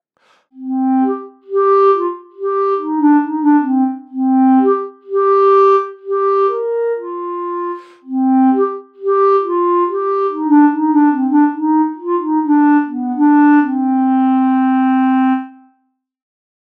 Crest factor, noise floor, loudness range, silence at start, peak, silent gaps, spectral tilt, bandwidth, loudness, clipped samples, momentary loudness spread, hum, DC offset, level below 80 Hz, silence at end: 14 dB; -65 dBFS; 3 LU; 0.55 s; 0 dBFS; none; -7.5 dB/octave; 4.6 kHz; -14 LUFS; under 0.1%; 11 LU; none; under 0.1%; under -90 dBFS; 1.15 s